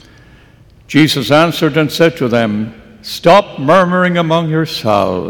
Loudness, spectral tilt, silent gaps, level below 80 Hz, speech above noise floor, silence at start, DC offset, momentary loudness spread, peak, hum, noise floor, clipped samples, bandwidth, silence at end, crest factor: -12 LUFS; -5.5 dB/octave; none; -48 dBFS; 31 dB; 0.9 s; under 0.1%; 8 LU; 0 dBFS; none; -43 dBFS; under 0.1%; 18 kHz; 0 s; 12 dB